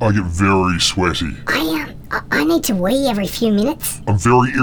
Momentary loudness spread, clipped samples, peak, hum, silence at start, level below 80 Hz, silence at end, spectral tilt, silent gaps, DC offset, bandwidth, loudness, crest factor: 8 LU; under 0.1%; -2 dBFS; none; 0 s; -38 dBFS; 0 s; -5 dB/octave; none; under 0.1%; over 20 kHz; -17 LUFS; 14 dB